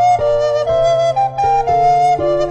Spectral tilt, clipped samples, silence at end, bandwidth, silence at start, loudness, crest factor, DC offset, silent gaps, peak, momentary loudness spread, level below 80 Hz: -5.5 dB/octave; under 0.1%; 0 s; 9.2 kHz; 0 s; -14 LUFS; 10 dB; under 0.1%; none; -4 dBFS; 3 LU; -36 dBFS